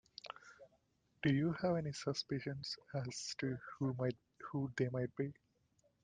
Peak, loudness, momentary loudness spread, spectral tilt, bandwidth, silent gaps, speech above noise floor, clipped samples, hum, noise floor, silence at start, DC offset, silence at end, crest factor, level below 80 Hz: -22 dBFS; -40 LUFS; 16 LU; -6 dB/octave; 9.6 kHz; none; 37 dB; under 0.1%; none; -77 dBFS; 0.25 s; under 0.1%; 0.7 s; 18 dB; -72 dBFS